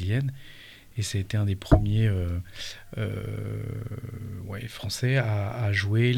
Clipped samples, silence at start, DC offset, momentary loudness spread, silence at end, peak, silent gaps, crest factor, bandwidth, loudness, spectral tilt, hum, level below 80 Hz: under 0.1%; 0 s; under 0.1%; 15 LU; 0 s; -4 dBFS; none; 22 dB; 14.5 kHz; -28 LUFS; -6 dB/octave; none; -40 dBFS